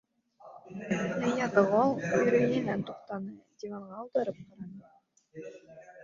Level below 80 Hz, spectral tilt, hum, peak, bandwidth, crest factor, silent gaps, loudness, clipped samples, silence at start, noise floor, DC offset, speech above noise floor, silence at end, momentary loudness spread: -70 dBFS; -6.5 dB/octave; none; -8 dBFS; 7.4 kHz; 22 dB; none; -29 LUFS; under 0.1%; 0.45 s; -64 dBFS; under 0.1%; 33 dB; 0 s; 21 LU